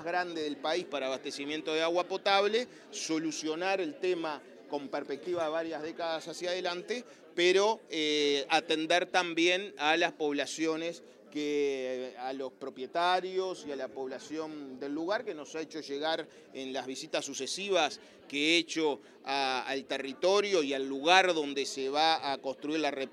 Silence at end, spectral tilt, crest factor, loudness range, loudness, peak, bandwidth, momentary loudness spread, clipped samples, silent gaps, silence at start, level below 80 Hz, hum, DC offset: 0 s; -2.5 dB/octave; 26 dB; 7 LU; -32 LUFS; -6 dBFS; 12.5 kHz; 12 LU; under 0.1%; none; 0 s; -88 dBFS; none; under 0.1%